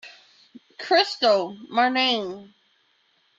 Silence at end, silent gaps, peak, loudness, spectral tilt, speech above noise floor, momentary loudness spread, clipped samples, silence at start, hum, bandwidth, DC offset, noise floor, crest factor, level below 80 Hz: 0.95 s; none; -4 dBFS; -21 LUFS; -3 dB/octave; 43 dB; 16 LU; under 0.1%; 0.05 s; none; 7.8 kHz; under 0.1%; -65 dBFS; 20 dB; -76 dBFS